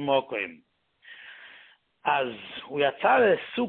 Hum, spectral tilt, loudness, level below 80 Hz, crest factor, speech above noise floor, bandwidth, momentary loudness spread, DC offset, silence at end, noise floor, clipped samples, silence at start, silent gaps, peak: none; -8.5 dB/octave; -26 LUFS; -70 dBFS; 18 dB; 31 dB; 4.4 kHz; 24 LU; under 0.1%; 0 s; -56 dBFS; under 0.1%; 0 s; none; -10 dBFS